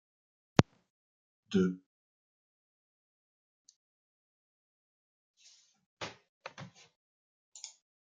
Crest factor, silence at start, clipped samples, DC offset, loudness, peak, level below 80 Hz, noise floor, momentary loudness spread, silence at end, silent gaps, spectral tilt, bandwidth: 38 dB; 0.6 s; under 0.1%; under 0.1%; -34 LUFS; -2 dBFS; -70 dBFS; -65 dBFS; 21 LU; 0.35 s; 0.90-1.43 s, 1.86-3.65 s, 3.76-5.34 s, 5.86-5.97 s, 6.29-6.41 s, 6.96-7.52 s; -6 dB/octave; 8.8 kHz